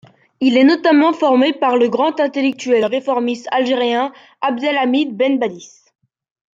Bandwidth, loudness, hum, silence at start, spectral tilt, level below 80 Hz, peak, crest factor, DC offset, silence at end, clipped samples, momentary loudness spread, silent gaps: 7.6 kHz; -16 LUFS; none; 0.4 s; -4.5 dB/octave; -70 dBFS; -2 dBFS; 14 dB; under 0.1%; 0.9 s; under 0.1%; 8 LU; none